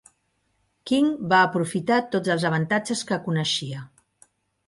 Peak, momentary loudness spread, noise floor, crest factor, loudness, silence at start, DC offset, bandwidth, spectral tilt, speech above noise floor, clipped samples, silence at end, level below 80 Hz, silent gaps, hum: -6 dBFS; 8 LU; -71 dBFS; 18 dB; -23 LUFS; 0.85 s; under 0.1%; 11.5 kHz; -5 dB/octave; 48 dB; under 0.1%; 0.8 s; -66 dBFS; none; none